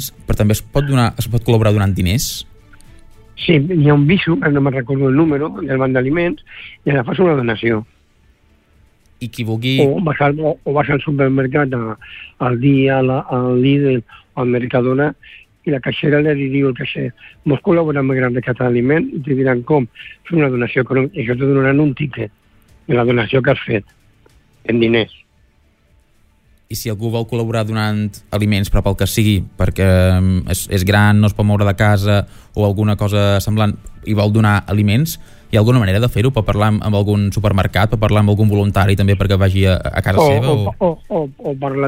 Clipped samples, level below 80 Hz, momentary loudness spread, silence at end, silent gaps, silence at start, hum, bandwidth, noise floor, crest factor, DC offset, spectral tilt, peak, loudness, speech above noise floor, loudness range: under 0.1%; -34 dBFS; 9 LU; 0 s; none; 0 s; none; 16 kHz; -54 dBFS; 14 dB; under 0.1%; -6.5 dB/octave; -2 dBFS; -15 LUFS; 40 dB; 5 LU